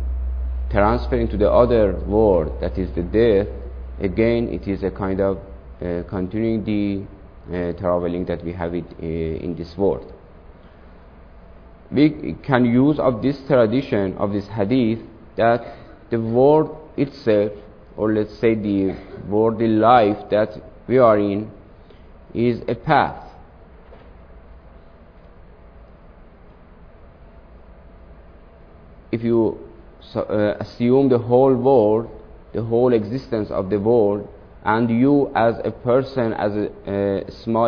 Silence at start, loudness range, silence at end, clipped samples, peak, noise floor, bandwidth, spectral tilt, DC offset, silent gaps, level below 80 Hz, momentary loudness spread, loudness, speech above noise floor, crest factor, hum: 0 s; 7 LU; 0 s; under 0.1%; -2 dBFS; -45 dBFS; 5.4 kHz; -10 dB/octave; under 0.1%; none; -36 dBFS; 13 LU; -20 LUFS; 26 dB; 20 dB; none